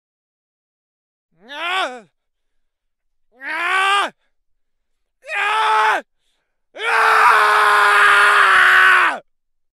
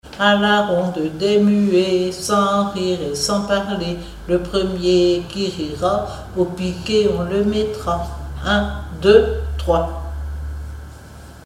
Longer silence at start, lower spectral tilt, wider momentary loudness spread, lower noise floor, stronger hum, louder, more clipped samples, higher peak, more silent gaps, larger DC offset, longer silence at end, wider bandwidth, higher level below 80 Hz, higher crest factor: first, 1.5 s vs 0.05 s; second, 0.5 dB/octave vs -5.5 dB/octave; about the same, 16 LU vs 14 LU; first, -70 dBFS vs -38 dBFS; neither; first, -13 LUFS vs -19 LUFS; neither; about the same, -2 dBFS vs 0 dBFS; neither; neither; first, 0.6 s vs 0 s; about the same, 15.5 kHz vs 15 kHz; second, -64 dBFS vs -32 dBFS; about the same, 16 dB vs 18 dB